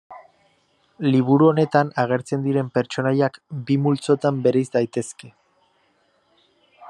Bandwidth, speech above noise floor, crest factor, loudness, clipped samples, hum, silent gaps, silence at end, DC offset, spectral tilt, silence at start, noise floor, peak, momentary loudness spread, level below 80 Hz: 10.5 kHz; 44 dB; 18 dB; -20 LUFS; under 0.1%; none; none; 0 s; under 0.1%; -7 dB/octave; 0.1 s; -64 dBFS; -4 dBFS; 10 LU; -68 dBFS